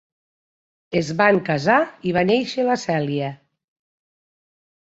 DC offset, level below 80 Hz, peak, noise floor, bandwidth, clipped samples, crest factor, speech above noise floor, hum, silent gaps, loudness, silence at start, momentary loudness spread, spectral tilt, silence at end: under 0.1%; -60 dBFS; -2 dBFS; under -90 dBFS; 8 kHz; under 0.1%; 20 dB; over 70 dB; none; none; -20 LUFS; 0.9 s; 8 LU; -6 dB/octave; 1.5 s